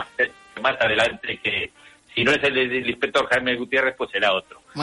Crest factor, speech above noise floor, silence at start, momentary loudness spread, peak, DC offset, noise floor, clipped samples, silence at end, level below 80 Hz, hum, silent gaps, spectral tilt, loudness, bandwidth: 16 dB; 23 dB; 0 s; 7 LU; -8 dBFS; under 0.1%; -45 dBFS; under 0.1%; 0 s; -56 dBFS; none; none; -4 dB/octave; -21 LUFS; 11.5 kHz